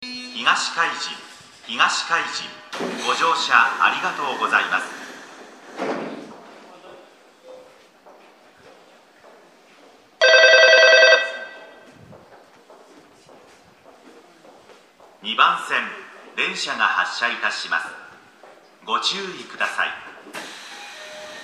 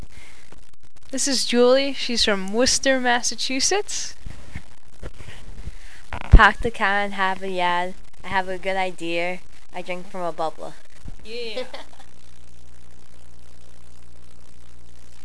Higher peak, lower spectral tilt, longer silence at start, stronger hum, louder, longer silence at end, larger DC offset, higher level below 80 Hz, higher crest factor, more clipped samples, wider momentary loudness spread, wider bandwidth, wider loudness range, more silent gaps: about the same, 0 dBFS vs 0 dBFS; second, -0.5 dB/octave vs -3 dB/octave; about the same, 0 s vs 0 s; neither; first, -18 LUFS vs -21 LUFS; second, 0 s vs 3.4 s; second, under 0.1% vs 5%; second, -78 dBFS vs -30 dBFS; about the same, 22 dB vs 24 dB; neither; about the same, 25 LU vs 24 LU; first, 13.5 kHz vs 11 kHz; second, 12 LU vs 15 LU; neither